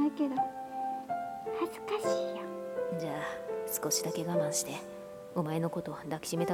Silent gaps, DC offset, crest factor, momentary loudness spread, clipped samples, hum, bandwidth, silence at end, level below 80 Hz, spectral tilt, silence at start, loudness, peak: none; under 0.1%; 16 dB; 8 LU; under 0.1%; none; 18 kHz; 0 s; -72 dBFS; -4.5 dB/octave; 0 s; -35 LUFS; -18 dBFS